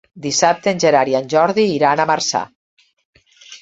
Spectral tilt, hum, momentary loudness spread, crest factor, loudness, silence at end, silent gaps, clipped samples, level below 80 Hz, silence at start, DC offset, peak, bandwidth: -3.5 dB/octave; none; 6 LU; 16 dB; -16 LUFS; 0.05 s; 2.55-2.77 s, 2.93-2.97 s, 3.05-3.13 s; under 0.1%; -60 dBFS; 0.15 s; under 0.1%; -2 dBFS; 8 kHz